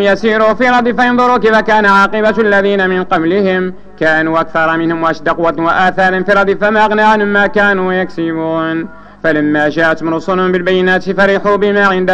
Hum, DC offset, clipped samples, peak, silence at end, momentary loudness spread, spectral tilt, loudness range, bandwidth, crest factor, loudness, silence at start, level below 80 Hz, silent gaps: none; under 0.1%; under 0.1%; 0 dBFS; 0 s; 6 LU; -6.5 dB/octave; 3 LU; 9.6 kHz; 10 dB; -11 LUFS; 0 s; -42 dBFS; none